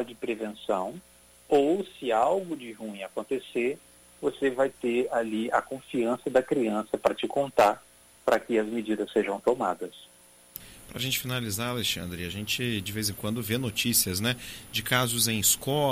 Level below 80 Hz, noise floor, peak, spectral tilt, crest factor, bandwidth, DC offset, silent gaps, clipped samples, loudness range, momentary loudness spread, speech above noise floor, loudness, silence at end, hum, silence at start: -58 dBFS; -49 dBFS; -8 dBFS; -3.5 dB/octave; 20 dB; 16.5 kHz; under 0.1%; none; under 0.1%; 4 LU; 13 LU; 21 dB; -28 LUFS; 0 s; none; 0 s